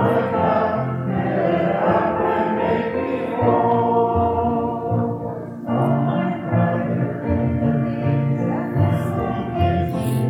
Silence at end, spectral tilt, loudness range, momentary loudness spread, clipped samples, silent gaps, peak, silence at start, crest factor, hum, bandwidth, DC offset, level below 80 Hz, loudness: 0 s; -9 dB/octave; 2 LU; 5 LU; under 0.1%; none; -6 dBFS; 0 s; 14 dB; none; 18 kHz; under 0.1%; -42 dBFS; -20 LUFS